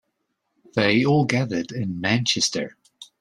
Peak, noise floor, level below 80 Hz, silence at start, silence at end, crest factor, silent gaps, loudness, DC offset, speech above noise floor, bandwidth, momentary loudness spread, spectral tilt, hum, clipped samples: -4 dBFS; -75 dBFS; -60 dBFS; 0.75 s; 0.15 s; 20 dB; none; -22 LUFS; under 0.1%; 54 dB; 12 kHz; 10 LU; -4.5 dB/octave; none; under 0.1%